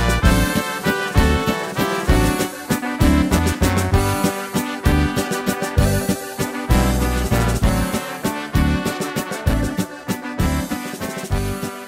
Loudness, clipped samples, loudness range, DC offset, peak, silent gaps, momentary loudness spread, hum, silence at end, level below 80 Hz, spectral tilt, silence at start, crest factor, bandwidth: -20 LUFS; under 0.1%; 4 LU; under 0.1%; 0 dBFS; none; 7 LU; none; 0 s; -24 dBFS; -5 dB/octave; 0 s; 18 dB; 16 kHz